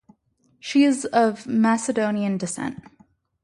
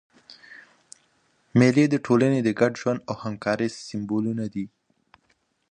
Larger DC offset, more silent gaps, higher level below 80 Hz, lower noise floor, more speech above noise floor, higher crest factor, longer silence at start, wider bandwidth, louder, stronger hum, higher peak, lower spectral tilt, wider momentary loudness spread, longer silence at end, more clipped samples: neither; neither; about the same, -64 dBFS vs -64 dBFS; second, -65 dBFS vs -69 dBFS; about the same, 43 dB vs 46 dB; about the same, 18 dB vs 20 dB; first, 0.65 s vs 0.5 s; first, 11.5 kHz vs 9.8 kHz; about the same, -22 LUFS vs -24 LUFS; neither; about the same, -6 dBFS vs -4 dBFS; second, -5 dB/octave vs -7 dB/octave; second, 12 LU vs 15 LU; second, 0.7 s vs 1.05 s; neither